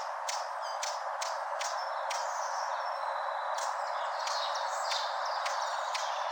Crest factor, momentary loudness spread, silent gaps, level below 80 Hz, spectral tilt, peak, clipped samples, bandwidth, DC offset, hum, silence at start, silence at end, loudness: 16 dB; 3 LU; none; under -90 dBFS; 5.5 dB/octave; -18 dBFS; under 0.1%; 18 kHz; under 0.1%; none; 0 s; 0 s; -34 LUFS